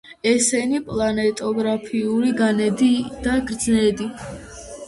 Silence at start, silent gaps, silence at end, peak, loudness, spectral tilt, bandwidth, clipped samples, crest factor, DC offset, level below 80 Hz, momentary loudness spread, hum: 0.05 s; none; 0 s; -6 dBFS; -20 LUFS; -4 dB/octave; 11.5 kHz; under 0.1%; 14 dB; under 0.1%; -46 dBFS; 11 LU; none